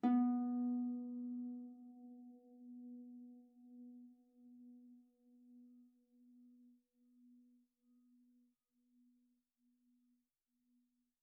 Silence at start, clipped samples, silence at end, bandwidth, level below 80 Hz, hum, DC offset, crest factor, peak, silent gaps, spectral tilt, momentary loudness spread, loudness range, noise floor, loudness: 0.05 s; under 0.1%; 4.75 s; 1.8 kHz; under -90 dBFS; none; under 0.1%; 22 dB; -26 dBFS; none; -0.5 dB/octave; 26 LU; 23 LU; -87 dBFS; -42 LUFS